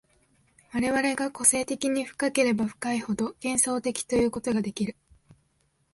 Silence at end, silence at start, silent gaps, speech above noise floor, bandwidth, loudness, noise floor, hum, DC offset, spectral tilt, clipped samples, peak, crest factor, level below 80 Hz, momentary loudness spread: 1 s; 0.75 s; none; 44 dB; 12 kHz; -26 LUFS; -70 dBFS; none; under 0.1%; -3.5 dB/octave; under 0.1%; -6 dBFS; 22 dB; -56 dBFS; 9 LU